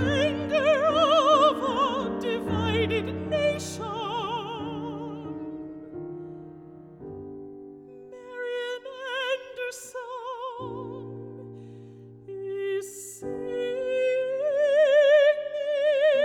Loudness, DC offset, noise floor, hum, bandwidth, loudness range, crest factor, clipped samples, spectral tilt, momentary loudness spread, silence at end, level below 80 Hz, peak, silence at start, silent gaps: -26 LUFS; under 0.1%; -46 dBFS; none; 14 kHz; 15 LU; 18 dB; under 0.1%; -5 dB/octave; 22 LU; 0 s; -58 dBFS; -8 dBFS; 0 s; none